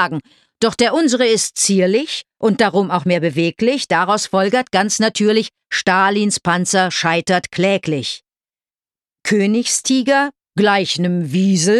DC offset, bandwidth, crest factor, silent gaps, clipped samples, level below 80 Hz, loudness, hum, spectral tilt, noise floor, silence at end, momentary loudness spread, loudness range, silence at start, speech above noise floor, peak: under 0.1%; 13 kHz; 14 dB; none; under 0.1%; -58 dBFS; -16 LUFS; none; -4 dB/octave; under -90 dBFS; 0 s; 5 LU; 3 LU; 0 s; over 74 dB; -2 dBFS